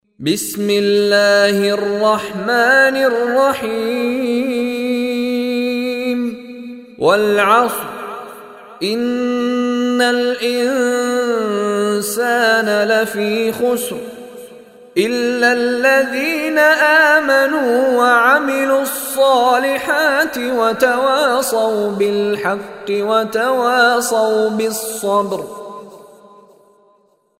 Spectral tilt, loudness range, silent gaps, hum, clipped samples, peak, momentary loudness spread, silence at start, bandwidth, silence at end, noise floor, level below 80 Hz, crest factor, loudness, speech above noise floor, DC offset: -3.5 dB/octave; 5 LU; none; none; under 0.1%; 0 dBFS; 10 LU; 0.2 s; 16 kHz; 1.35 s; -57 dBFS; -60 dBFS; 16 dB; -15 LUFS; 42 dB; under 0.1%